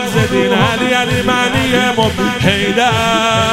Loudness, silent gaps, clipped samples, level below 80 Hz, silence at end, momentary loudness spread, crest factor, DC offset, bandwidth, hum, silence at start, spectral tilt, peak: -12 LUFS; none; under 0.1%; -36 dBFS; 0 s; 2 LU; 12 dB; under 0.1%; 16 kHz; none; 0 s; -4.5 dB/octave; 0 dBFS